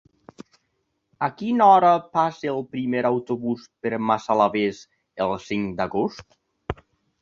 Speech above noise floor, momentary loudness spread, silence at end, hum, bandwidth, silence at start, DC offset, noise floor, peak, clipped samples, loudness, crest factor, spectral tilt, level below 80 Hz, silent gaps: 52 dB; 19 LU; 0.5 s; none; 7.4 kHz; 1.2 s; under 0.1%; -74 dBFS; -4 dBFS; under 0.1%; -22 LUFS; 20 dB; -6.5 dB/octave; -54 dBFS; none